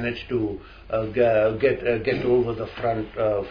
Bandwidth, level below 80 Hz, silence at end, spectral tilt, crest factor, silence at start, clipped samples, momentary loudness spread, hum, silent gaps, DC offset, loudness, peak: 5.2 kHz; -46 dBFS; 0 s; -9 dB/octave; 14 dB; 0 s; under 0.1%; 8 LU; none; none; under 0.1%; -24 LUFS; -8 dBFS